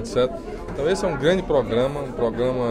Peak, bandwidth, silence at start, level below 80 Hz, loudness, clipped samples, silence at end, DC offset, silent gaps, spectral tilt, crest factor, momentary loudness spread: -6 dBFS; 11.5 kHz; 0 s; -40 dBFS; -23 LUFS; under 0.1%; 0 s; under 0.1%; none; -6 dB/octave; 16 dB; 5 LU